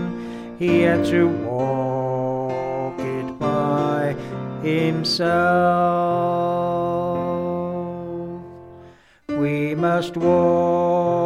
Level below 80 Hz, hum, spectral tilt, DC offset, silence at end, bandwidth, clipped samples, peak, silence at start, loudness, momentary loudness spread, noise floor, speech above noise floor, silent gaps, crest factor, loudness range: -52 dBFS; none; -7 dB/octave; under 0.1%; 0 s; 13.5 kHz; under 0.1%; -6 dBFS; 0 s; -21 LUFS; 12 LU; -47 dBFS; 29 dB; none; 16 dB; 5 LU